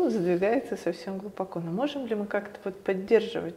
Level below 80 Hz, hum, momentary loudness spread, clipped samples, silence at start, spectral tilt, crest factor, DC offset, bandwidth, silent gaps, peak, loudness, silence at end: -66 dBFS; none; 10 LU; under 0.1%; 0 s; -7 dB/octave; 20 dB; under 0.1%; 15 kHz; none; -8 dBFS; -29 LUFS; 0 s